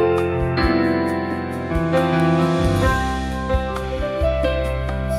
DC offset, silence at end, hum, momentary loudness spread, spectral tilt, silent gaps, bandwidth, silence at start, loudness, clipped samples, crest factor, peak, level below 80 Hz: under 0.1%; 0 s; none; 7 LU; -7 dB/octave; none; 14.5 kHz; 0 s; -20 LUFS; under 0.1%; 14 dB; -6 dBFS; -28 dBFS